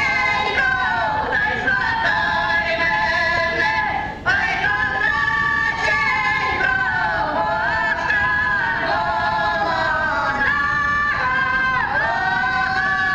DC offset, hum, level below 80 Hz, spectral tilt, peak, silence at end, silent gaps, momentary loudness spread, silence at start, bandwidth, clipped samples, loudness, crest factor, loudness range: under 0.1%; none; -40 dBFS; -4 dB/octave; -6 dBFS; 0 s; none; 2 LU; 0 s; 9.6 kHz; under 0.1%; -18 LUFS; 14 dB; 1 LU